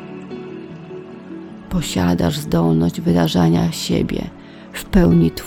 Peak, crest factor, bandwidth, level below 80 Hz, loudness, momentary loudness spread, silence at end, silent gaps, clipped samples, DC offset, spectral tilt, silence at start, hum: -2 dBFS; 18 dB; 16.5 kHz; -34 dBFS; -17 LUFS; 19 LU; 0 s; none; under 0.1%; under 0.1%; -6.5 dB/octave; 0 s; none